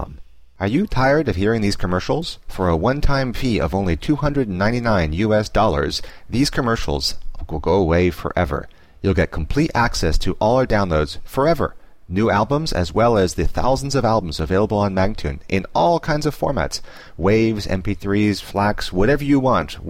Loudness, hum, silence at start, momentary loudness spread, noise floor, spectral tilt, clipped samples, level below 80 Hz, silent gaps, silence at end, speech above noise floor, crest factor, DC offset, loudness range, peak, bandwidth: -20 LUFS; none; 0 s; 7 LU; -39 dBFS; -6 dB/octave; under 0.1%; -30 dBFS; none; 0 s; 21 dB; 12 dB; 0.7%; 1 LU; -6 dBFS; 16 kHz